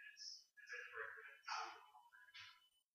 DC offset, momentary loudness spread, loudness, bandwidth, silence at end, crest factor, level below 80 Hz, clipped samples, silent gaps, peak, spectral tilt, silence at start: under 0.1%; 13 LU; -53 LUFS; 15 kHz; 0.15 s; 22 dB; under -90 dBFS; under 0.1%; none; -34 dBFS; 1 dB/octave; 0 s